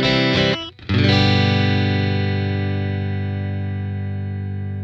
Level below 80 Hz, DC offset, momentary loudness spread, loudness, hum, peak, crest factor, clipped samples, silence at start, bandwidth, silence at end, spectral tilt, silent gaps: -46 dBFS; under 0.1%; 11 LU; -20 LUFS; 50 Hz at -55 dBFS; -2 dBFS; 16 dB; under 0.1%; 0 s; 7.2 kHz; 0 s; -6.5 dB/octave; none